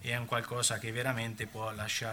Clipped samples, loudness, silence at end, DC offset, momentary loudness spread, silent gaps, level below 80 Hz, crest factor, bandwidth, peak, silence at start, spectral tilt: under 0.1%; -34 LUFS; 0 s; under 0.1%; 7 LU; none; -64 dBFS; 20 dB; 19.5 kHz; -16 dBFS; 0 s; -3 dB/octave